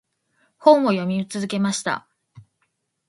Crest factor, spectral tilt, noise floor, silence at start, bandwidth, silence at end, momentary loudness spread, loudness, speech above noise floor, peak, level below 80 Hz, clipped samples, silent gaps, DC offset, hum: 22 dB; -5 dB/octave; -72 dBFS; 0.6 s; 11.5 kHz; 0.7 s; 11 LU; -20 LUFS; 53 dB; 0 dBFS; -68 dBFS; under 0.1%; none; under 0.1%; none